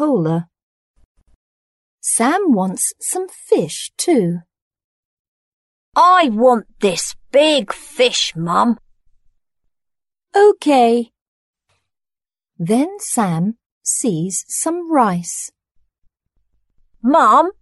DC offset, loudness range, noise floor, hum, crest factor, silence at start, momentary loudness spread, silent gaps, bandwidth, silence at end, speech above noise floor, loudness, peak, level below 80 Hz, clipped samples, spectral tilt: under 0.1%; 5 LU; -90 dBFS; none; 16 dB; 0 s; 12 LU; 0.63-0.94 s, 1.05-1.15 s, 1.35-1.98 s, 4.62-4.71 s, 4.84-5.92 s, 11.21-11.53 s, 13.66-13.81 s; 12 kHz; 0.1 s; 74 dB; -16 LUFS; -2 dBFS; -60 dBFS; under 0.1%; -4 dB/octave